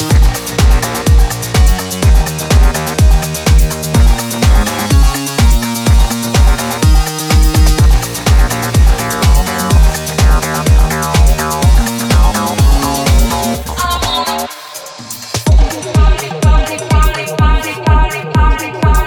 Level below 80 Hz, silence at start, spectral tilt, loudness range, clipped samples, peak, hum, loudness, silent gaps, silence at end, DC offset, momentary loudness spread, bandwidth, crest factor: -12 dBFS; 0 s; -4.5 dB/octave; 3 LU; under 0.1%; 0 dBFS; none; -12 LUFS; none; 0 s; under 0.1%; 3 LU; 19.5 kHz; 10 dB